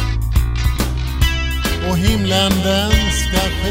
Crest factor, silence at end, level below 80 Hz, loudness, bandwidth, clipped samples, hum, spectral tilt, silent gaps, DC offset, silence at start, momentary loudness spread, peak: 16 dB; 0 s; -20 dBFS; -17 LUFS; 16.5 kHz; under 0.1%; none; -4.5 dB/octave; none; under 0.1%; 0 s; 5 LU; 0 dBFS